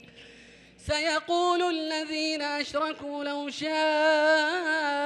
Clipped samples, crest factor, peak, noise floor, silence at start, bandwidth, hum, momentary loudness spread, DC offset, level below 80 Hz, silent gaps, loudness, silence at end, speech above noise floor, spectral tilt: under 0.1%; 16 dB; -10 dBFS; -52 dBFS; 0.15 s; 11 kHz; none; 10 LU; under 0.1%; -58 dBFS; none; -27 LUFS; 0 s; 26 dB; -3 dB/octave